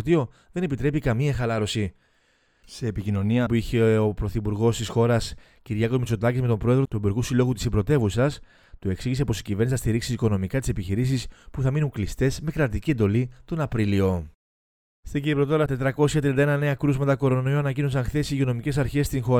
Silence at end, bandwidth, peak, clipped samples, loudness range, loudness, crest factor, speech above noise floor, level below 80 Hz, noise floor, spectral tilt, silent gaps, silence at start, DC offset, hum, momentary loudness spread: 0 s; 16 kHz; -6 dBFS; under 0.1%; 3 LU; -24 LUFS; 16 dB; 41 dB; -40 dBFS; -64 dBFS; -7 dB/octave; 14.35-15.03 s; 0 s; under 0.1%; none; 8 LU